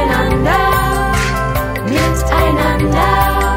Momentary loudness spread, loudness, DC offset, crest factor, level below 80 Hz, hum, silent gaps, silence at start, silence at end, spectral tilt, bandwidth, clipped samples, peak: 4 LU; -14 LUFS; under 0.1%; 12 dB; -20 dBFS; none; none; 0 s; 0 s; -5.5 dB/octave; 16.5 kHz; under 0.1%; 0 dBFS